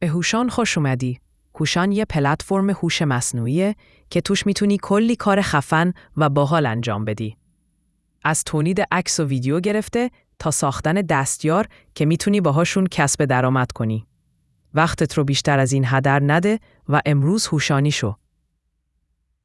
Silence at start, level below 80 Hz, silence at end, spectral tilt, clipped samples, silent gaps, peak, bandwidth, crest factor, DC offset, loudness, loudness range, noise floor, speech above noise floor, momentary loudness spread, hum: 0 s; -48 dBFS; 1.3 s; -5 dB/octave; under 0.1%; none; -2 dBFS; 12 kHz; 18 dB; under 0.1%; -20 LUFS; 3 LU; -71 dBFS; 51 dB; 7 LU; none